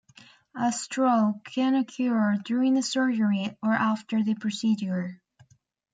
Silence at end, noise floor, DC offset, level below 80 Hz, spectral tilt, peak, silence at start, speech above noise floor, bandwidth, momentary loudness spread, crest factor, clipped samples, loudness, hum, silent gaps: 0.8 s; -64 dBFS; under 0.1%; -76 dBFS; -5 dB/octave; -12 dBFS; 0.55 s; 39 dB; 9.4 kHz; 5 LU; 14 dB; under 0.1%; -26 LUFS; none; none